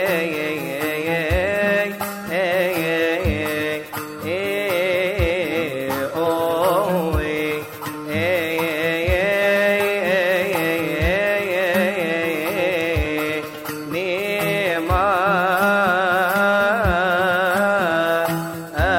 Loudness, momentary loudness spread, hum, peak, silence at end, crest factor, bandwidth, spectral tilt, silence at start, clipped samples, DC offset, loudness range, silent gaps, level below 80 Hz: -20 LUFS; 7 LU; none; -6 dBFS; 0 s; 14 dB; 16.5 kHz; -5 dB/octave; 0 s; under 0.1%; under 0.1%; 4 LU; none; -36 dBFS